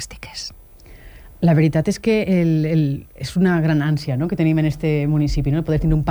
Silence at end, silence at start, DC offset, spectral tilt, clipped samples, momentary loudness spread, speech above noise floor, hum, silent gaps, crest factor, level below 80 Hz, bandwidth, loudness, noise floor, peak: 0 s; 0 s; under 0.1%; -7.5 dB/octave; under 0.1%; 11 LU; 24 dB; none; none; 12 dB; -34 dBFS; over 20 kHz; -19 LUFS; -42 dBFS; -6 dBFS